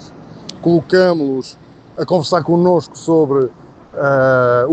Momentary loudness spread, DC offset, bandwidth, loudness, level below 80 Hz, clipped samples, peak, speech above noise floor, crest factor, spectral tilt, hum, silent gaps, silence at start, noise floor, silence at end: 19 LU; under 0.1%; 8.6 kHz; -15 LUFS; -56 dBFS; under 0.1%; 0 dBFS; 21 dB; 14 dB; -7 dB/octave; none; none; 0 s; -34 dBFS; 0 s